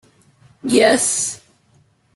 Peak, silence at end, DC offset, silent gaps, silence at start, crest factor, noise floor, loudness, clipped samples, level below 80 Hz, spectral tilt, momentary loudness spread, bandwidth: -2 dBFS; 0.8 s; under 0.1%; none; 0.65 s; 18 dB; -57 dBFS; -16 LUFS; under 0.1%; -60 dBFS; -2 dB/octave; 17 LU; 12.5 kHz